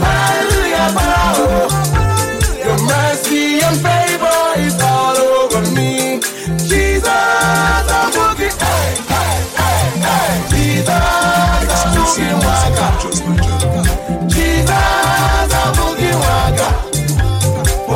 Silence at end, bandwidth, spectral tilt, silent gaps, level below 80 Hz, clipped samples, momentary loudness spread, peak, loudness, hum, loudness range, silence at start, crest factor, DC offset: 0 s; 16.5 kHz; -4 dB/octave; none; -22 dBFS; under 0.1%; 4 LU; 0 dBFS; -13 LUFS; none; 1 LU; 0 s; 12 dB; under 0.1%